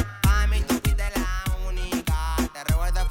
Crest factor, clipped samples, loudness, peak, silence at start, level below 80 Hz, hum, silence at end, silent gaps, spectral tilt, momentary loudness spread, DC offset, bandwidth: 14 dB; under 0.1%; -25 LUFS; -8 dBFS; 0 s; -24 dBFS; none; 0 s; none; -5 dB/octave; 6 LU; under 0.1%; 17 kHz